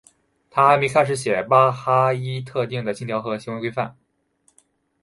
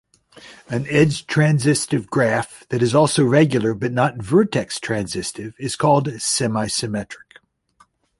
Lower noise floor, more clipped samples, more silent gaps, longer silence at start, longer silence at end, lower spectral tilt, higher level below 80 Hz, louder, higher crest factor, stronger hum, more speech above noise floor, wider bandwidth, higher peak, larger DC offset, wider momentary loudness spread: first, -64 dBFS vs -58 dBFS; neither; neither; about the same, 0.55 s vs 0.45 s; about the same, 1.1 s vs 1 s; about the same, -5.5 dB/octave vs -5 dB/octave; second, -62 dBFS vs -52 dBFS; about the same, -20 LUFS vs -19 LUFS; about the same, 20 dB vs 18 dB; neither; first, 44 dB vs 39 dB; about the same, 11.5 kHz vs 11.5 kHz; about the same, -2 dBFS vs -2 dBFS; neither; about the same, 11 LU vs 11 LU